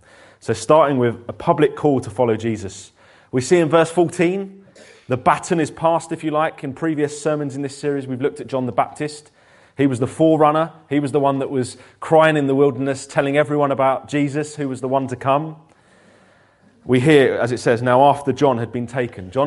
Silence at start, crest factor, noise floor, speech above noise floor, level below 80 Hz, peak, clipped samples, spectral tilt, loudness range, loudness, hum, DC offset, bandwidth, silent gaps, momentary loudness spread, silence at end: 0.45 s; 18 dB; -54 dBFS; 36 dB; -58 dBFS; 0 dBFS; under 0.1%; -6 dB/octave; 5 LU; -19 LUFS; none; under 0.1%; 11.5 kHz; none; 11 LU; 0 s